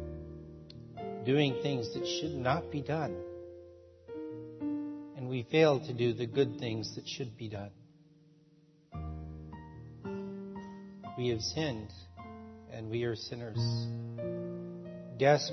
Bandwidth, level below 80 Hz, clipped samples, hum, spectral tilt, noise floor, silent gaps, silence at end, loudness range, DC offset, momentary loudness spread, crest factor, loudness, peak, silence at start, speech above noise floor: 6.2 kHz; -60 dBFS; under 0.1%; none; -5 dB/octave; -64 dBFS; none; 0 s; 12 LU; under 0.1%; 20 LU; 22 dB; -35 LUFS; -14 dBFS; 0 s; 32 dB